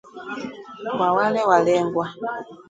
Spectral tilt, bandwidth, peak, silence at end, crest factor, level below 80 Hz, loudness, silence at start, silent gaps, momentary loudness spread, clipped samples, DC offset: -5.5 dB/octave; 9.2 kHz; -4 dBFS; 0.05 s; 20 dB; -64 dBFS; -21 LUFS; 0.05 s; none; 16 LU; under 0.1%; under 0.1%